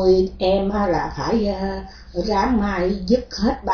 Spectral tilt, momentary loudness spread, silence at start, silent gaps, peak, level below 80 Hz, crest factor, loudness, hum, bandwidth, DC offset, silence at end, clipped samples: -6.5 dB/octave; 8 LU; 0 s; none; -4 dBFS; -34 dBFS; 16 dB; -21 LUFS; none; 5.4 kHz; under 0.1%; 0 s; under 0.1%